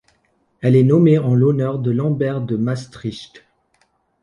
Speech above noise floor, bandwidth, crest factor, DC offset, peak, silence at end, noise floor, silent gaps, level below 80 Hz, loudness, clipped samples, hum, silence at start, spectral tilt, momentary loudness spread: 47 dB; 10 kHz; 14 dB; under 0.1%; -4 dBFS; 0.95 s; -63 dBFS; none; -56 dBFS; -17 LUFS; under 0.1%; none; 0.6 s; -9 dB/octave; 16 LU